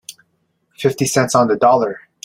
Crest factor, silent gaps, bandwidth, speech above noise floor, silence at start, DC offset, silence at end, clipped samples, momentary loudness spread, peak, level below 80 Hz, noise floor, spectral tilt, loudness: 16 dB; none; 16.5 kHz; 51 dB; 0.1 s; under 0.1%; 0.25 s; under 0.1%; 9 LU; -2 dBFS; -56 dBFS; -66 dBFS; -4.5 dB/octave; -16 LUFS